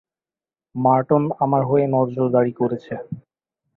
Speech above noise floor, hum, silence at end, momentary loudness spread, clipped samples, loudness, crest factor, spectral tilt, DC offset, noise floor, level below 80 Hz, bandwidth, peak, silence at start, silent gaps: over 71 dB; none; 0.55 s; 15 LU; under 0.1%; -19 LUFS; 18 dB; -11.5 dB/octave; under 0.1%; under -90 dBFS; -62 dBFS; 4.2 kHz; -4 dBFS; 0.75 s; none